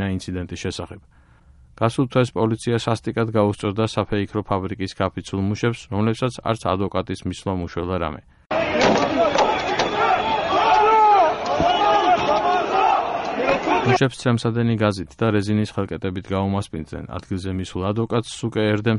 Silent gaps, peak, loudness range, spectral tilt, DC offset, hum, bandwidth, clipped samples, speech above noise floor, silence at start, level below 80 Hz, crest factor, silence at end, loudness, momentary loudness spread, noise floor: none; -4 dBFS; 7 LU; -6 dB/octave; under 0.1%; none; 11.5 kHz; under 0.1%; 28 dB; 0 s; -46 dBFS; 18 dB; 0 s; -21 LUFS; 11 LU; -50 dBFS